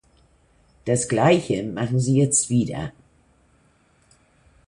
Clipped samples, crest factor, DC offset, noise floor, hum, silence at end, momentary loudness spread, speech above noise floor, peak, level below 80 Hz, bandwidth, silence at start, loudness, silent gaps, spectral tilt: under 0.1%; 20 dB; under 0.1%; -60 dBFS; none; 1.75 s; 13 LU; 40 dB; -4 dBFS; -54 dBFS; 11.5 kHz; 0.85 s; -21 LUFS; none; -5 dB/octave